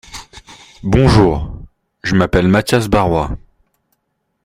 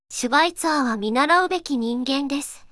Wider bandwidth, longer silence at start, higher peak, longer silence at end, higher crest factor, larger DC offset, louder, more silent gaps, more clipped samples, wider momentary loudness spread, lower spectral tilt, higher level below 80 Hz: first, 16 kHz vs 12 kHz; about the same, 0.1 s vs 0.1 s; first, 0 dBFS vs -6 dBFS; first, 1.1 s vs 0.05 s; about the same, 16 dB vs 16 dB; neither; first, -14 LUFS vs -21 LUFS; neither; neither; first, 20 LU vs 7 LU; first, -6.5 dB/octave vs -2.5 dB/octave; first, -30 dBFS vs -58 dBFS